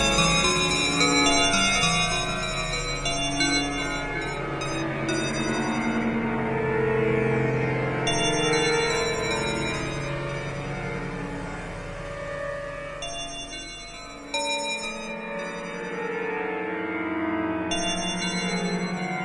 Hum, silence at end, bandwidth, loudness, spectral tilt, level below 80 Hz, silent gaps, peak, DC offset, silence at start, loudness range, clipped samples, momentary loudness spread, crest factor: none; 0 s; 11.5 kHz; -25 LUFS; -3.5 dB/octave; -42 dBFS; none; -8 dBFS; under 0.1%; 0 s; 10 LU; under 0.1%; 13 LU; 18 dB